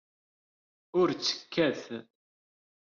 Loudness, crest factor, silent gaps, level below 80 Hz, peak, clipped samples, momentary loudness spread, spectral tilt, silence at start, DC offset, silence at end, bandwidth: -30 LUFS; 18 dB; none; -74 dBFS; -14 dBFS; under 0.1%; 14 LU; -3 dB/octave; 0.95 s; under 0.1%; 0.8 s; 7.2 kHz